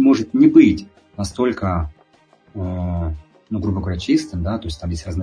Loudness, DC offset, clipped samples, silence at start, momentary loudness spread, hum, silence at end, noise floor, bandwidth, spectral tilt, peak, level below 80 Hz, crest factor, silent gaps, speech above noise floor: -19 LUFS; under 0.1%; under 0.1%; 0 s; 17 LU; none; 0 s; -54 dBFS; 10.5 kHz; -7 dB/octave; 0 dBFS; -36 dBFS; 18 dB; none; 36 dB